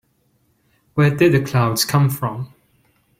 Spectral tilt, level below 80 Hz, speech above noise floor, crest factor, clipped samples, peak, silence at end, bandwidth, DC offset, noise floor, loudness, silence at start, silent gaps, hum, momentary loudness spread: -5.5 dB/octave; -52 dBFS; 46 dB; 16 dB; under 0.1%; -4 dBFS; 0.75 s; 16.5 kHz; under 0.1%; -63 dBFS; -18 LUFS; 0.95 s; none; none; 13 LU